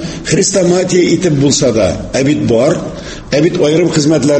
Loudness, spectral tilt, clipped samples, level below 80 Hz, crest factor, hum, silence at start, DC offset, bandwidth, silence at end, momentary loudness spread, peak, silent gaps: -11 LUFS; -5 dB/octave; under 0.1%; -36 dBFS; 12 dB; none; 0 s; under 0.1%; 8.8 kHz; 0 s; 5 LU; 0 dBFS; none